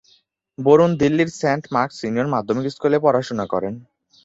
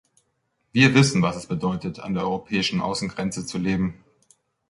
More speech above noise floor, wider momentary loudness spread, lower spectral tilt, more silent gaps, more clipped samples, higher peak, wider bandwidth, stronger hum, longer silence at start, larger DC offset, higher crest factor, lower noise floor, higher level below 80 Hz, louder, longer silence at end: second, 41 dB vs 50 dB; about the same, 10 LU vs 12 LU; first, -6.5 dB/octave vs -5 dB/octave; neither; neither; about the same, -2 dBFS vs -2 dBFS; second, 8 kHz vs 11.5 kHz; neither; second, 0.6 s vs 0.75 s; neither; about the same, 18 dB vs 22 dB; second, -59 dBFS vs -72 dBFS; about the same, -56 dBFS vs -52 dBFS; first, -19 LUFS vs -23 LUFS; second, 0.4 s vs 0.75 s